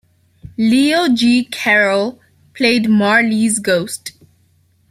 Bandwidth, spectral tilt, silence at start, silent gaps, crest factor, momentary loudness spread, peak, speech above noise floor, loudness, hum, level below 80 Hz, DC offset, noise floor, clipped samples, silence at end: 15 kHz; -4 dB/octave; 0.6 s; none; 14 dB; 13 LU; -2 dBFS; 42 dB; -14 LUFS; none; -54 dBFS; under 0.1%; -56 dBFS; under 0.1%; 0.8 s